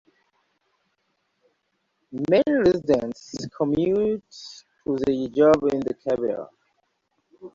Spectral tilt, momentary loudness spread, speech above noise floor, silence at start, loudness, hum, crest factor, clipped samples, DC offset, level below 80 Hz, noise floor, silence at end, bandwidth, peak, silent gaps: -6.5 dB/octave; 18 LU; 52 dB; 2.1 s; -23 LUFS; none; 18 dB; under 0.1%; under 0.1%; -56 dBFS; -74 dBFS; 0.05 s; 7.6 kHz; -6 dBFS; none